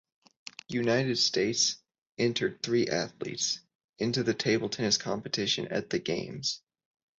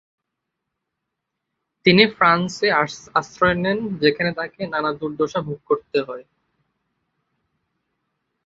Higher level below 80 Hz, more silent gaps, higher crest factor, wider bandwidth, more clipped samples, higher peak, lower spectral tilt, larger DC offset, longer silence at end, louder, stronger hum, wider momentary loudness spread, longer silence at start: second, -68 dBFS vs -56 dBFS; first, 2.02-2.06 s, 3.75-3.93 s vs none; about the same, 18 dB vs 22 dB; about the same, 8.2 kHz vs 7.8 kHz; neither; second, -12 dBFS vs -2 dBFS; second, -3.5 dB/octave vs -5.5 dB/octave; neither; second, 0.6 s vs 2.25 s; second, -29 LUFS vs -20 LUFS; neither; about the same, 10 LU vs 11 LU; second, 0.7 s vs 1.85 s